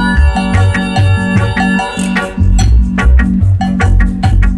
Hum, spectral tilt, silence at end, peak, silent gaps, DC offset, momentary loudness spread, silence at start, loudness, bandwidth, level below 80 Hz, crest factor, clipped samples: none; -6.5 dB/octave; 0 s; 0 dBFS; none; under 0.1%; 3 LU; 0 s; -11 LUFS; 11.5 kHz; -12 dBFS; 10 dB; under 0.1%